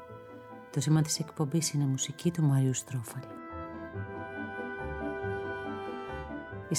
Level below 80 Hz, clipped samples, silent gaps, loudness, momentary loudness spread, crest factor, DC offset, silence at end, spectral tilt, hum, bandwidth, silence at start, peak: -56 dBFS; under 0.1%; none; -33 LUFS; 14 LU; 18 dB; under 0.1%; 0 s; -5 dB/octave; none; 15.5 kHz; 0 s; -16 dBFS